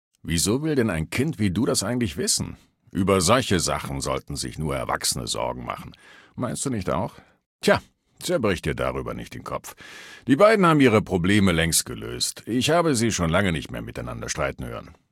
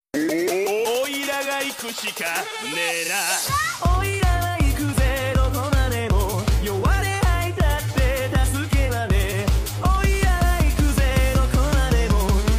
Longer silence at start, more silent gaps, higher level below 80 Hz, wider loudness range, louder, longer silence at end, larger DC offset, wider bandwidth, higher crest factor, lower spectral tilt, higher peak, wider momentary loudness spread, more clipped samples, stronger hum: about the same, 0.25 s vs 0.15 s; first, 7.46-7.59 s vs none; second, -44 dBFS vs -22 dBFS; first, 7 LU vs 2 LU; about the same, -23 LUFS vs -21 LUFS; first, 0.2 s vs 0 s; neither; about the same, 17 kHz vs 16 kHz; first, 20 dB vs 12 dB; about the same, -4.5 dB/octave vs -4.5 dB/octave; first, -4 dBFS vs -8 dBFS; first, 15 LU vs 4 LU; neither; neither